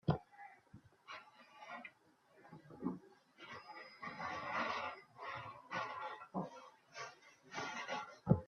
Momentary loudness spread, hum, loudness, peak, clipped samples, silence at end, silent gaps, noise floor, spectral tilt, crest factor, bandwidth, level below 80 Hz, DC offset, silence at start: 20 LU; none; -46 LUFS; -18 dBFS; under 0.1%; 0 s; none; -70 dBFS; -6 dB/octave; 26 dB; 7.2 kHz; -68 dBFS; under 0.1%; 0.05 s